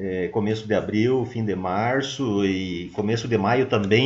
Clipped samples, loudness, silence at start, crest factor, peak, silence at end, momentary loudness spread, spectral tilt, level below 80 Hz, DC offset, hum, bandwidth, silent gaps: under 0.1%; -23 LUFS; 0 s; 18 dB; -4 dBFS; 0 s; 6 LU; -6 dB/octave; -56 dBFS; under 0.1%; none; 8 kHz; none